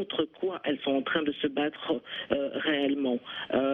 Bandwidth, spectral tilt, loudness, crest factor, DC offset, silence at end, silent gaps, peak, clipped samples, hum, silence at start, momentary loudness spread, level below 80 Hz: 4.1 kHz; -7 dB/octave; -30 LUFS; 18 dB; under 0.1%; 0 s; none; -10 dBFS; under 0.1%; none; 0 s; 5 LU; -66 dBFS